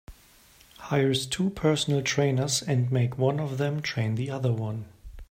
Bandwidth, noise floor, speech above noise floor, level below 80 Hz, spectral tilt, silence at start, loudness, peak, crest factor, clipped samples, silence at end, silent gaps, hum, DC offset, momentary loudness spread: 16 kHz; -56 dBFS; 30 dB; -52 dBFS; -5 dB/octave; 0.1 s; -27 LUFS; -10 dBFS; 18 dB; under 0.1%; 0.05 s; none; none; under 0.1%; 6 LU